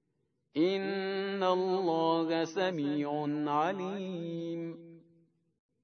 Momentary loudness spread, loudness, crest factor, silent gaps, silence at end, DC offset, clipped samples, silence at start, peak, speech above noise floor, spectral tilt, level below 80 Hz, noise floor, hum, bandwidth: 9 LU; -32 LUFS; 16 dB; none; 0.85 s; under 0.1%; under 0.1%; 0.55 s; -16 dBFS; 47 dB; -6.5 dB/octave; under -90 dBFS; -79 dBFS; none; 6.6 kHz